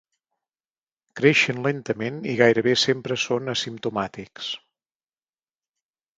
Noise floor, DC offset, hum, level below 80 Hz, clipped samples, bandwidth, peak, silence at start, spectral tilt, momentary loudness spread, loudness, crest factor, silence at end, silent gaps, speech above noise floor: under -90 dBFS; under 0.1%; none; -64 dBFS; under 0.1%; 9.2 kHz; -2 dBFS; 1.15 s; -4.5 dB/octave; 14 LU; -22 LUFS; 24 dB; 1.6 s; none; over 67 dB